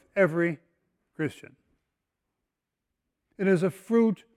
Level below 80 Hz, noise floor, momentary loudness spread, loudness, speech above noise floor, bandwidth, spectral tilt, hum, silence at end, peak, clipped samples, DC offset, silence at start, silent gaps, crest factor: -74 dBFS; -85 dBFS; 10 LU; -27 LUFS; 60 dB; 14 kHz; -8 dB/octave; none; 0.2 s; -10 dBFS; under 0.1%; under 0.1%; 0.15 s; none; 20 dB